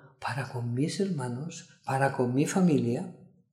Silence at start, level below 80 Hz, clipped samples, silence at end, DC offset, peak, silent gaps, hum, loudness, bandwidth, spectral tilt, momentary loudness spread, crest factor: 0.05 s; -72 dBFS; under 0.1%; 0.3 s; under 0.1%; -12 dBFS; none; none; -29 LUFS; 14 kHz; -6.5 dB/octave; 13 LU; 18 dB